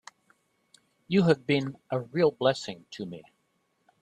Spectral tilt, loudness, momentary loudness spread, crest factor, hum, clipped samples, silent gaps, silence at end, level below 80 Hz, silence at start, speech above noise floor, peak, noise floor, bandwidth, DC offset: -6.5 dB/octave; -27 LUFS; 16 LU; 20 dB; none; under 0.1%; none; 0.8 s; -68 dBFS; 1.1 s; 46 dB; -8 dBFS; -74 dBFS; 10 kHz; under 0.1%